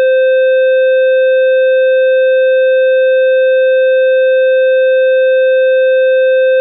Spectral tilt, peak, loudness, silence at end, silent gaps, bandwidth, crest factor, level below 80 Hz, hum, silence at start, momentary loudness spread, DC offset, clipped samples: 5 dB/octave; -8 dBFS; -9 LUFS; 0 s; none; 3.9 kHz; 2 dB; under -90 dBFS; 60 Hz at -120 dBFS; 0 s; 0 LU; under 0.1%; under 0.1%